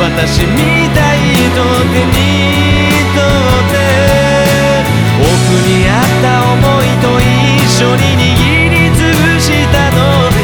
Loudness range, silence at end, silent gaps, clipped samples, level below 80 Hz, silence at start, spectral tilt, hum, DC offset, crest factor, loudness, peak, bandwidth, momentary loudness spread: 1 LU; 0 s; none; under 0.1%; -22 dBFS; 0 s; -5 dB/octave; none; 0.3%; 8 dB; -9 LUFS; 0 dBFS; over 20 kHz; 2 LU